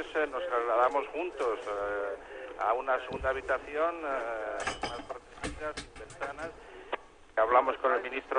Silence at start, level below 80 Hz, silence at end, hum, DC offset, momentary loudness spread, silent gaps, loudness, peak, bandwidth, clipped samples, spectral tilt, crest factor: 0 s; -56 dBFS; 0 s; none; under 0.1%; 15 LU; none; -32 LUFS; -12 dBFS; 10 kHz; under 0.1%; -4 dB/octave; 20 dB